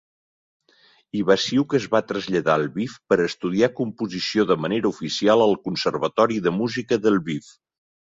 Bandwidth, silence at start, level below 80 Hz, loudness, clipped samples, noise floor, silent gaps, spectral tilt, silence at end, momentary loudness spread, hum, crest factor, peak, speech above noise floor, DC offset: 7.8 kHz; 1.15 s; -60 dBFS; -22 LUFS; under 0.1%; -58 dBFS; none; -5.5 dB/octave; 0.7 s; 8 LU; none; 18 dB; -4 dBFS; 37 dB; under 0.1%